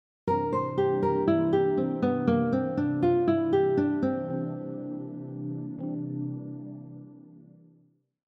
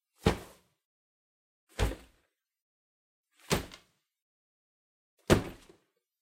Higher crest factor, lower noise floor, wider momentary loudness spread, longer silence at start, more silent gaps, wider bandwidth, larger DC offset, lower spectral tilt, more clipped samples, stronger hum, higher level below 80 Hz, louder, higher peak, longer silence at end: second, 18 dB vs 28 dB; second, -64 dBFS vs -75 dBFS; second, 14 LU vs 20 LU; about the same, 0.25 s vs 0.25 s; second, none vs 0.85-1.67 s, 2.61-3.24 s, 4.22-5.18 s; second, 6 kHz vs 16 kHz; neither; first, -10 dB/octave vs -5 dB/octave; neither; neither; second, -66 dBFS vs -46 dBFS; first, -28 LUFS vs -32 LUFS; about the same, -10 dBFS vs -8 dBFS; first, 0.9 s vs 0.7 s